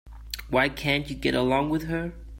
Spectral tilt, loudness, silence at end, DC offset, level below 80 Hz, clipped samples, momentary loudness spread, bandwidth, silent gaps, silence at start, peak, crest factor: -5.5 dB/octave; -26 LUFS; 0 s; under 0.1%; -42 dBFS; under 0.1%; 9 LU; 16.5 kHz; none; 0.05 s; -8 dBFS; 18 dB